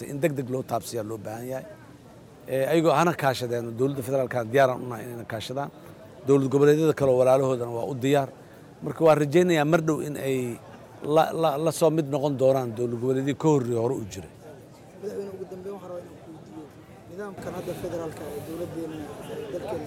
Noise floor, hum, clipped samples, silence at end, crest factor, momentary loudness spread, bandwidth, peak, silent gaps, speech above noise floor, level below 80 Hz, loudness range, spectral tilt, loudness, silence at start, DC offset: -48 dBFS; none; under 0.1%; 0 s; 18 dB; 19 LU; 17 kHz; -8 dBFS; none; 23 dB; -62 dBFS; 14 LU; -6.5 dB/octave; -25 LUFS; 0 s; under 0.1%